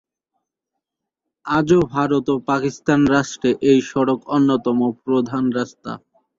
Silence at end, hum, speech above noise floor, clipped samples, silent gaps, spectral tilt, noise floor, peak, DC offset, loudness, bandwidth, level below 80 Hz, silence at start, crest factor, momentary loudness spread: 0.4 s; none; 64 dB; under 0.1%; none; -6.5 dB/octave; -82 dBFS; -4 dBFS; under 0.1%; -19 LUFS; 7.8 kHz; -52 dBFS; 1.45 s; 16 dB; 10 LU